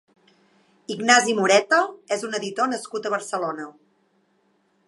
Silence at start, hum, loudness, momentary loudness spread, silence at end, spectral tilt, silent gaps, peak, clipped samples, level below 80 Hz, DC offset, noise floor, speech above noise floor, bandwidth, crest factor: 0.9 s; none; -21 LUFS; 17 LU; 1.15 s; -2.5 dB/octave; none; 0 dBFS; under 0.1%; -78 dBFS; under 0.1%; -66 dBFS; 44 dB; 11.5 kHz; 24 dB